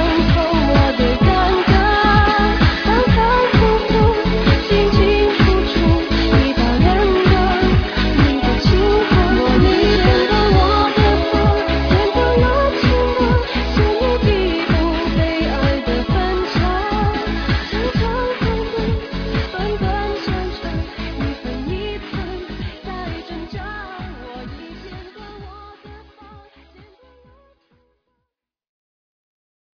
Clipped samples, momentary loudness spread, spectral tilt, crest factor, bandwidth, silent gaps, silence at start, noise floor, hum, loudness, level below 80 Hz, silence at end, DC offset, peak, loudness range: under 0.1%; 15 LU; -7 dB/octave; 16 dB; 5.4 kHz; none; 0 s; -78 dBFS; none; -16 LUFS; -22 dBFS; 3.75 s; under 0.1%; 0 dBFS; 14 LU